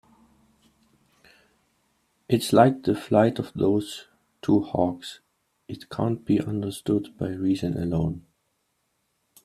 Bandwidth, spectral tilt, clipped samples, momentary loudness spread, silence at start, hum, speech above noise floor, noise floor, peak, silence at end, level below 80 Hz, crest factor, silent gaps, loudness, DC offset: 15 kHz; -7 dB/octave; under 0.1%; 17 LU; 2.3 s; none; 50 dB; -74 dBFS; -2 dBFS; 1.25 s; -56 dBFS; 24 dB; none; -24 LUFS; under 0.1%